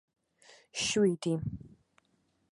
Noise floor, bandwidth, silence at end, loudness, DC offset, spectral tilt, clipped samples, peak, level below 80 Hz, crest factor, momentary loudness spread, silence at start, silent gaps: -74 dBFS; 11.5 kHz; 0.85 s; -31 LUFS; under 0.1%; -4.5 dB/octave; under 0.1%; -18 dBFS; -60 dBFS; 18 dB; 14 LU; 0.75 s; none